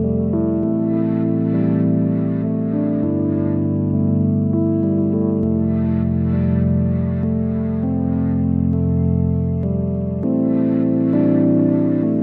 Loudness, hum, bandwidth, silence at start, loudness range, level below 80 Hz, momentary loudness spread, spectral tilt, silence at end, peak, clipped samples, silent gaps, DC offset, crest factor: -18 LUFS; none; 3.1 kHz; 0 s; 1 LU; -38 dBFS; 4 LU; -13.5 dB/octave; 0 s; -6 dBFS; under 0.1%; none; under 0.1%; 12 dB